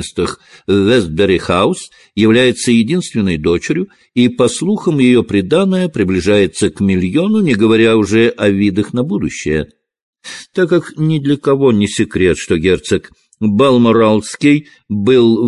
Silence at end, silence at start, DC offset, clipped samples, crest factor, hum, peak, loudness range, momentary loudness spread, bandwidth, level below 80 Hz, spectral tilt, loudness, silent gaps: 0 s; 0 s; under 0.1%; under 0.1%; 12 dB; none; 0 dBFS; 3 LU; 9 LU; 11.5 kHz; -38 dBFS; -6 dB/octave; -13 LUFS; 10.02-10.13 s